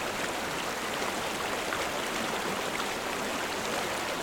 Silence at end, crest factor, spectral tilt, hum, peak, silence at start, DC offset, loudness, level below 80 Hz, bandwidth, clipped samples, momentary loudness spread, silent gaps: 0 s; 18 dB; -2 dB/octave; none; -14 dBFS; 0 s; under 0.1%; -31 LUFS; -58 dBFS; over 20 kHz; under 0.1%; 1 LU; none